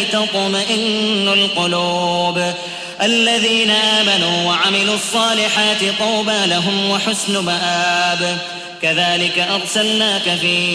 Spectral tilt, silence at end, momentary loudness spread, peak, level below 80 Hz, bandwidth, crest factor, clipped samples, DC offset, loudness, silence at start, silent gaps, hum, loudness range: -2.5 dB/octave; 0 s; 5 LU; -2 dBFS; -60 dBFS; 11 kHz; 14 dB; under 0.1%; under 0.1%; -15 LUFS; 0 s; none; none; 3 LU